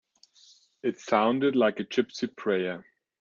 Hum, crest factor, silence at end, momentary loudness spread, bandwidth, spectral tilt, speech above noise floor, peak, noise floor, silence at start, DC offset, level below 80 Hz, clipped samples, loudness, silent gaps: none; 20 dB; 0.4 s; 10 LU; 7.4 kHz; -5.5 dB/octave; 33 dB; -8 dBFS; -59 dBFS; 0.85 s; under 0.1%; -74 dBFS; under 0.1%; -27 LUFS; none